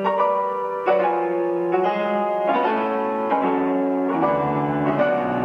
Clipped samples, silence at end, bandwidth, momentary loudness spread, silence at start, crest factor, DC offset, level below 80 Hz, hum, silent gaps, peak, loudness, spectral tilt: under 0.1%; 0 s; 6.4 kHz; 3 LU; 0 s; 14 dB; under 0.1%; -58 dBFS; none; none; -6 dBFS; -21 LUFS; -8.5 dB/octave